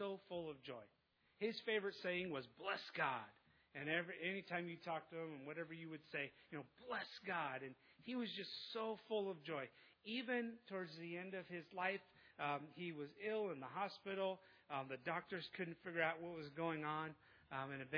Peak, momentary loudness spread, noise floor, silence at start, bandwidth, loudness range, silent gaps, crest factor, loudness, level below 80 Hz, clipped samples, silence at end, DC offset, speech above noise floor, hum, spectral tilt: -26 dBFS; 9 LU; -80 dBFS; 0 s; 5.4 kHz; 3 LU; none; 22 dB; -47 LUFS; -88 dBFS; under 0.1%; 0 s; under 0.1%; 33 dB; none; -3 dB/octave